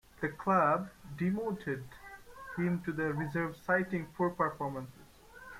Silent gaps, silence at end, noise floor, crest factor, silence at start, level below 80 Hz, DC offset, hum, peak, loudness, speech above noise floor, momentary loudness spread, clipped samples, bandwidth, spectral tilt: none; 0 s; -55 dBFS; 18 dB; 0.2 s; -62 dBFS; under 0.1%; none; -16 dBFS; -34 LUFS; 22 dB; 20 LU; under 0.1%; 15.5 kHz; -8 dB/octave